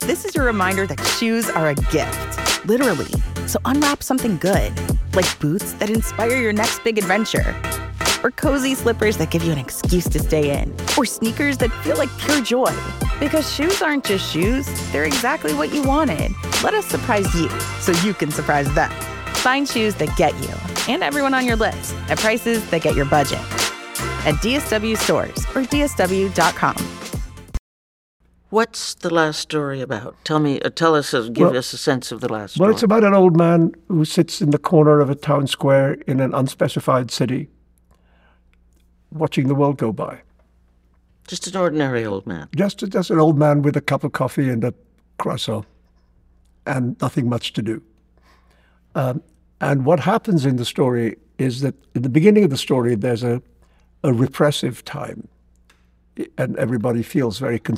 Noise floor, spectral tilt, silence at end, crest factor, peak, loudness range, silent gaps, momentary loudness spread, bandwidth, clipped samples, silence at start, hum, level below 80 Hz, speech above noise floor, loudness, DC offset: -57 dBFS; -5 dB/octave; 0 s; 18 dB; -2 dBFS; 7 LU; 27.59-28.20 s; 9 LU; 19 kHz; under 0.1%; 0 s; none; -34 dBFS; 38 dB; -19 LUFS; under 0.1%